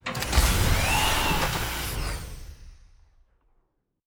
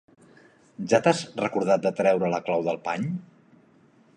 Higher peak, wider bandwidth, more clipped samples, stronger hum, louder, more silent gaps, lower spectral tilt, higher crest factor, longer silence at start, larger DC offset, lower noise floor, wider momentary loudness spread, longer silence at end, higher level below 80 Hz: second, -8 dBFS vs -4 dBFS; first, over 20 kHz vs 10.5 kHz; neither; neither; about the same, -25 LUFS vs -25 LUFS; neither; second, -3 dB/octave vs -5.5 dB/octave; about the same, 20 dB vs 22 dB; second, 0.05 s vs 0.8 s; neither; first, -71 dBFS vs -58 dBFS; first, 14 LU vs 9 LU; first, 1.3 s vs 0.9 s; first, -32 dBFS vs -70 dBFS